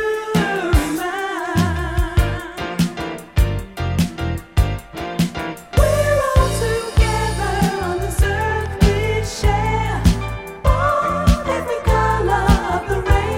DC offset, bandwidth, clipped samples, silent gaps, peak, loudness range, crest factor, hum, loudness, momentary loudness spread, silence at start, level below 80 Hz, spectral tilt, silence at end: under 0.1%; 16.5 kHz; under 0.1%; none; 0 dBFS; 3 LU; 18 dB; none; -19 LUFS; 7 LU; 0 s; -22 dBFS; -6 dB/octave; 0 s